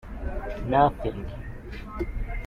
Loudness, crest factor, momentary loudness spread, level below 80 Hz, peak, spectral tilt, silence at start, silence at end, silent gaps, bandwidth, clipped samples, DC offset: -28 LUFS; 20 dB; 18 LU; -34 dBFS; -8 dBFS; -8.5 dB/octave; 0.05 s; 0 s; none; 10.5 kHz; under 0.1%; under 0.1%